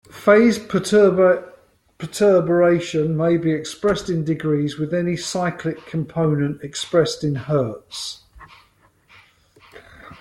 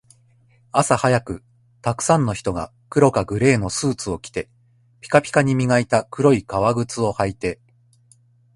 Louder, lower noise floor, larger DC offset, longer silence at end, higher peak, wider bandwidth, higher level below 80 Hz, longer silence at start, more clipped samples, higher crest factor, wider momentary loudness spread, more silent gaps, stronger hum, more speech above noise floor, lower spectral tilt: about the same, -19 LUFS vs -20 LUFS; about the same, -57 dBFS vs -56 dBFS; neither; second, 0.05 s vs 1 s; about the same, -2 dBFS vs 0 dBFS; first, 13.5 kHz vs 11.5 kHz; second, -54 dBFS vs -46 dBFS; second, 0.15 s vs 0.75 s; neither; about the same, 18 dB vs 20 dB; about the same, 13 LU vs 11 LU; neither; second, none vs 60 Hz at -45 dBFS; about the same, 38 dB vs 37 dB; about the same, -6 dB/octave vs -5.5 dB/octave